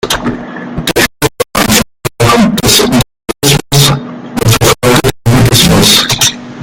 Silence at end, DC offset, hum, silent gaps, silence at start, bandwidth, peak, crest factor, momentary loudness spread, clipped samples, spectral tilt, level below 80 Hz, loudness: 0 s; under 0.1%; none; none; 0.05 s; over 20 kHz; 0 dBFS; 10 dB; 12 LU; 0.7%; -3.5 dB/octave; -28 dBFS; -8 LUFS